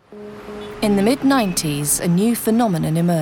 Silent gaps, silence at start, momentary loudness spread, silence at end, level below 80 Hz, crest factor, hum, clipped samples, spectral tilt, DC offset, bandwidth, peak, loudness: none; 0.1 s; 17 LU; 0 s; -46 dBFS; 14 dB; none; under 0.1%; -5 dB/octave; under 0.1%; 19 kHz; -4 dBFS; -18 LUFS